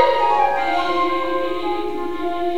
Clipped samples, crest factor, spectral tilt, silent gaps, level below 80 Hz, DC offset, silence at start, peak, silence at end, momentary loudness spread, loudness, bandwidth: under 0.1%; 18 dB; -4.5 dB/octave; none; -48 dBFS; 4%; 0 s; 0 dBFS; 0 s; 8 LU; -20 LUFS; 16 kHz